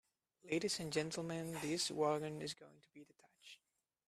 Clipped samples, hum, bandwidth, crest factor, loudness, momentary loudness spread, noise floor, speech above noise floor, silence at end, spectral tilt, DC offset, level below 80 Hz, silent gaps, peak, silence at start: under 0.1%; none; 15 kHz; 20 dB; -41 LUFS; 22 LU; -84 dBFS; 43 dB; 0.55 s; -4 dB/octave; under 0.1%; -78 dBFS; none; -24 dBFS; 0.45 s